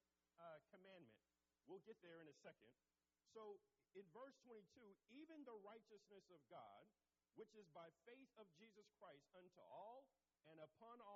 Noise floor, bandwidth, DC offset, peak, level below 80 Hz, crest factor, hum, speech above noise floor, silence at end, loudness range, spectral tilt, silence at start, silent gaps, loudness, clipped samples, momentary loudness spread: under -90 dBFS; 7.4 kHz; under 0.1%; -50 dBFS; under -90 dBFS; 16 dB; none; over 25 dB; 0 s; 2 LU; -4 dB/octave; 0.35 s; none; -66 LUFS; under 0.1%; 7 LU